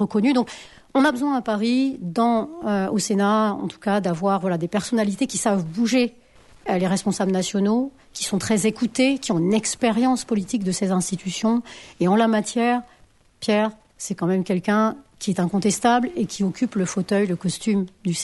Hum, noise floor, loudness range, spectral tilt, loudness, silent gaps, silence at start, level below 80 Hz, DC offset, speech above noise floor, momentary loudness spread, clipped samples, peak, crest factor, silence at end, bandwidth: none; -49 dBFS; 1 LU; -5 dB/octave; -22 LUFS; none; 0 s; -58 dBFS; under 0.1%; 27 dB; 7 LU; under 0.1%; -6 dBFS; 16 dB; 0 s; 11.5 kHz